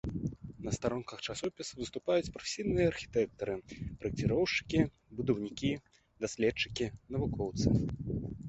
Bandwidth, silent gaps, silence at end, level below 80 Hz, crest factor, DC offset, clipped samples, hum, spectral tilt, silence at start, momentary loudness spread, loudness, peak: 8.2 kHz; none; 0 s; -50 dBFS; 22 dB; under 0.1%; under 0.1%; none; -5.5 dB/octave; 0.05 s; 9 LU; -35 LUFS; -12 dBFS